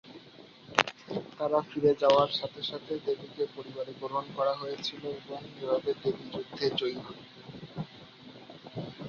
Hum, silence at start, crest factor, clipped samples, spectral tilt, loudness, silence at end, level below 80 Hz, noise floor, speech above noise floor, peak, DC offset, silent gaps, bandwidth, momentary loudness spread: none; 0.05 s; 30 dB; under 0.1%; -5 dB/octave; -32 LUFS; 0 s; -68 dBFS; -53 dBFS; 22 dB; -2 dBFS; under 0.1%; none; 7.4 kHz; 22 LU